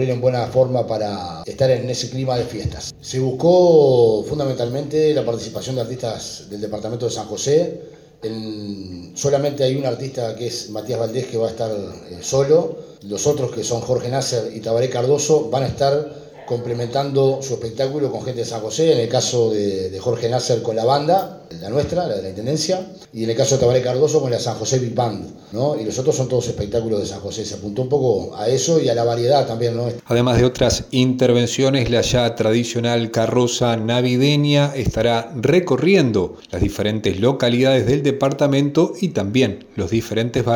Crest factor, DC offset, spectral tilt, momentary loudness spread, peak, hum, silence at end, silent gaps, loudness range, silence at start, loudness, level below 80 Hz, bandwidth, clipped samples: 16 dB; under 0.1%; -5.5 dB/octave; 11 LU; -2 dBFS; none; 0 s; none; 5 LU; 0 s; -19 LUFS; -44 dBFS; 17.5 kHz; under 0.1%